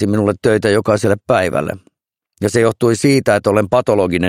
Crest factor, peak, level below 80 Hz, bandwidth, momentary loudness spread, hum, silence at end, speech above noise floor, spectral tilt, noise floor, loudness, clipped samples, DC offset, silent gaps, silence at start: 14 dB; 0 dBFS; -46 dBFS; 15.5 kHz; 6 LU; none; 0 s; 51 dB; -6 dB/octave; -65 dBFS; -15 LUFS; under 0.1%; under 0.1%; none; 0 s